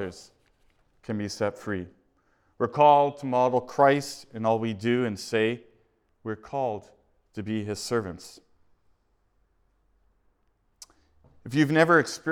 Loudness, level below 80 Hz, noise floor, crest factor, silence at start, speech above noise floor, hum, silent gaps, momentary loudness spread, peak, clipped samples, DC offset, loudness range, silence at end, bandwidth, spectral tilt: -25 LUFS; -66 dBFS; -69 dBFS; 22 dB; 0 s; 44 dB; none; none; 19 LU; -6 dBFS; under 0.1%; under 0.1%; 12 LU; 0 s; 16.5 kHz; -5.5 dB/octave